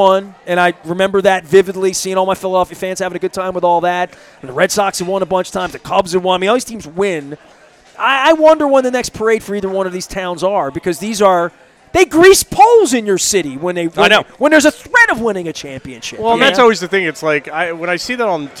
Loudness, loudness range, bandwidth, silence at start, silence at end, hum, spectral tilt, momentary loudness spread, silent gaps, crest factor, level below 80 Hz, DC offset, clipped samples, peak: -13 LUFS; 6 LU; 16 kHz; 0 s; 0 s; none; -3.5 dB/octave; 11 LU; none; 14 dB; -46 dBFS; under 0.1%; 0.3%; 0 dBFS